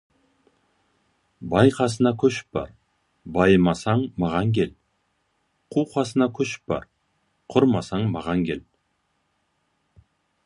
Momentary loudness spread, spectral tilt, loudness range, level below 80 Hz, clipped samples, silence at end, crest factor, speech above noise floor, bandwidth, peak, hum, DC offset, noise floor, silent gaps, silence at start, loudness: 12 LU; -6.5 dB/octave; 5 LU; -50 dBFS; under 0.1%; 1.85 s; 22 dB; 50 dB; 11.5 kHz; -2 dBFS; none; under 0.1%; -71 dBFS; none; 1.4 s; -23 LUFS